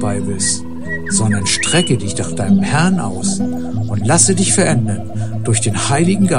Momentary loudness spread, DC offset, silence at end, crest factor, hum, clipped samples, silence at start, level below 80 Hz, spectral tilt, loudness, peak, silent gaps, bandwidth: 10 LU; 5%; 0 s; 16 dB; none; under 0.1%; 0 s; -42 dBFS; -4 dB/octave; -15 LUFS; 0 dBFS; none; 11.5 kHz